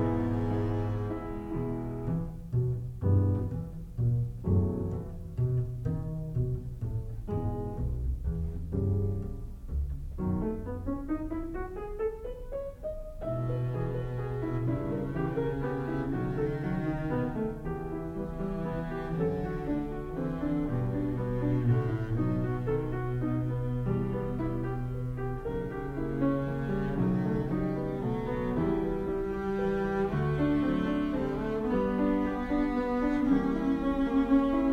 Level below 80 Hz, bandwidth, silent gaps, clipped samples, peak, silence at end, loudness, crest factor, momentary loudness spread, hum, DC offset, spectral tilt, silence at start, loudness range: -42 dBFS; 7.4 kHz; none; under 0.1%; -14 dBFS; 0 s; -32 LUFS; 16 dB; 8 LU; none; under 0.1%; -9.5 dB/octave; 0 s; 5 LU